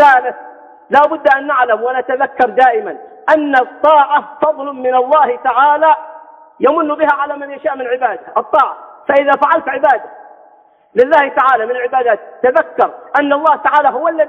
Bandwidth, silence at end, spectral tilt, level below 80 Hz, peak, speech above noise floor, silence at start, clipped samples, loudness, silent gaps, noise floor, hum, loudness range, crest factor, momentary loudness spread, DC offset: 7 kHz; 0 s; -5 dB/octave; -62 dBFS; 0 dBFS; 35 dB; 0 s; under 0.1%; -13 LUFS; none; -47 dBFS; none; 2 LU; 12 dB; 9 LU; under 0.1%